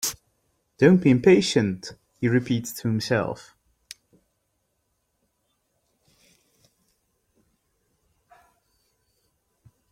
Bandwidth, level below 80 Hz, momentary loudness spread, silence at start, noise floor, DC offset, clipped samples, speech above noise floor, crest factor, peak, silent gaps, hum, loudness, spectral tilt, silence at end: 16.5 kHz; -60 dBFS; 28 LU; 0 s; -74 dBFS; under 0.1%; under 0.1%; 54 dB; 22 dB; -4 dBFS; none; none; -22 LUFS; -5.5 dB/octave; 6.55 s